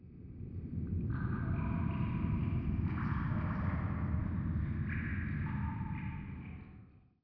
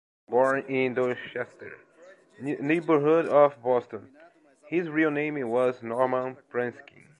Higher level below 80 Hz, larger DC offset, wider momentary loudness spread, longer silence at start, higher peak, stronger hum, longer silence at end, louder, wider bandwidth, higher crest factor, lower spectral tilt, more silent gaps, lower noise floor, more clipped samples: first, -44 dBFS vs -78 dBFS; neither; second, 11 LU vs 15 LU; second, 0 s vs 0.3 s; second, -22 dBFS vs -8 dBFS; neither; second, 0.25 s vs 0.4 s; second, -37 LUFS vs -26 LUFS; second, 4.9 kHz vs 10.5 kHz; about the same, 16 dB vs 20 dB; about the same, -8.5 dB/octave vs -7.5 dB/octave; neither; first, -58 dBFS vs -54 dBFS; neither